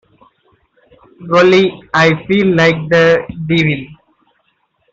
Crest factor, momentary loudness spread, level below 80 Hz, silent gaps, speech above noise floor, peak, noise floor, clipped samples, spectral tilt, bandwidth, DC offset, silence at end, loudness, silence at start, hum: 12 dB; 7 LU; -48 dBFS; none; 50 dB; -2 dBFS; -62 dBFS; under 0.1%; -6.5 dB/octave; 7.8 kHz; under 0.1%; 1 s; -12 LUFS; 1.2 s; none